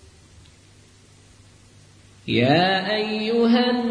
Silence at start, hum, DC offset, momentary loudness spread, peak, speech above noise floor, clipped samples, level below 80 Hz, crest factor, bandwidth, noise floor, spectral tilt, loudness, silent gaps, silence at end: 2.25 s; none; under 0.1%; 6 LU; -6 dBFS; 32 dB; under 0.1%; -58 dBFS; 18 dB; 10 kHz; -51 dBFS; -6.5 dB/octave; -20 LUFS; none; 0 s